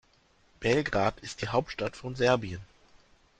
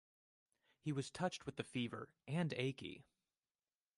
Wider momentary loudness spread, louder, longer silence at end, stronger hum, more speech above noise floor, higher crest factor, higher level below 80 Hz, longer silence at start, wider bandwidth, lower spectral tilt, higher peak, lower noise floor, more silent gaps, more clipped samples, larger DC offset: about the same, 10 LU vs 11 LU; first, -29 LUFS vs -44 LUFS; second, 0.75 s vs 0.95 s; neither; second, 36 dB vs over 46 dB; about the same, 22 dB vs 20 dB; first, -54 dBFS vs -78 dBFS; second, 0.6 s vs 0.85 s; second, 9.4 kHz vs 11.5 kHz; about the same, -5.5 dB/octave vs -5.5 dB/octave; first, -10 dBFS vs -26 dBFS; second, -65 dBFS vs under -90 dBFS; neither; neither; neither